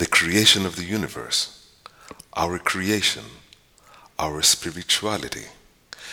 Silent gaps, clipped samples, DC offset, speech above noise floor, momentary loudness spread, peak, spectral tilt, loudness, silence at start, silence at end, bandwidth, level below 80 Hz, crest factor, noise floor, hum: none; under 0.1%; under 0.1%; 30 dB; 17 LU; -2 dBFS; -2 dB/octave; -21 LUFS; 0 s; 0 s; over 20 kHz; -52 dBFS; 22 dB; -53 dBFS; none